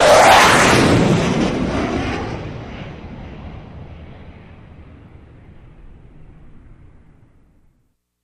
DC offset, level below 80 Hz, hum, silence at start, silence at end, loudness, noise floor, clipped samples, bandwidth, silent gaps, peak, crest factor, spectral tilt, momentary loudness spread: under 0.1%; -36 dBFS; none; 0 s; 3.95 s; -13 LUFS; -64 dBFS; under 0.1%; 15.5 kHz; none; 0 dBFS; 18 dB; -4 dB/octave; 28 LU